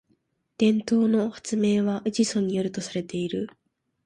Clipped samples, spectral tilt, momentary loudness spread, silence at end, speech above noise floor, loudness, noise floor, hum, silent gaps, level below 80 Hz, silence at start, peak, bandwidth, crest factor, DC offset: under 0.1%; -5.5 dB/octave; 9 LU; 0.55 s; 45 dB; -25 LUFS; -70 dBFS; none; none; -64 dBFS; 0.6 s; -10 dBFS; 11 kHz; 16 dB; under 0.1%